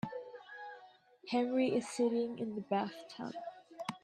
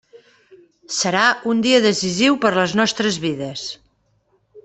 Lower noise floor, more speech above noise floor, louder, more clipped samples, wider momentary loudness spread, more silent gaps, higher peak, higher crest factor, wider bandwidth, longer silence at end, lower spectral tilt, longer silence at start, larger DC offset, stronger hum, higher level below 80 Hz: about the same, -60 dBFS vs -63 dBFS; second, 25 dB vs 45 dB; second, -37 LUFS vs -18 LUFS; neither; first, 17 LU vs 12 LU; neither; second, -20 dBFS vs -2 dBFS; about the same, 16 dB vs 18 dB; first, 12 kHz vs 8.4 kHz; about the same, 0.05 s vs 0.05 s; first, -5.5 dB/octave vs -3.5 dB/octave; about the same, 0.05 s vs 0.15 s; neither; neither; second, -80 dBFS vs -60 dBFS